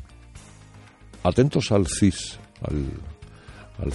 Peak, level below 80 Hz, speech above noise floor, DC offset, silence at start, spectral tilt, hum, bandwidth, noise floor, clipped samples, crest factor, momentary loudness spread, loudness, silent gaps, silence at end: -6 dBFS; -40 dBFS; 25 dB; under 0.1%; 0 s; -6 dB/octave; none; 11.5 kHz; -48 dBFS; under 0.1%; 20 dB; 25 LU; -24 LUFS; none; 0 s